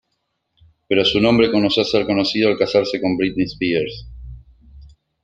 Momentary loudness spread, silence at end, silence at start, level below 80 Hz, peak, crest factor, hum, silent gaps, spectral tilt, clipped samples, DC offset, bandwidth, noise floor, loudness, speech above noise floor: 11 LU; 0.35 s; 0.9 s; -44 dBFS; -2 dBFS; 18 dB; none; none; -6 dB/octave; under 0.1%; under 0.1%; 9.2 kHz; -72 dBFS; -18 LUFS; 55 dB